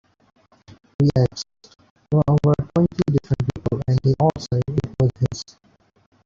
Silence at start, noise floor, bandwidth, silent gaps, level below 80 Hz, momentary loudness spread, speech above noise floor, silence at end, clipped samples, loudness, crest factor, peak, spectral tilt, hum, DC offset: 1 s; -59 dBFS; 7.4 kHz; 1.90-1.96 s; -44 dBFS; 12 LU; 41 dB; 0.85 s; under 0.1%; -21 LUFS; 16 dB; -6 dBFS; -8 dB/octave; none; under 0.1%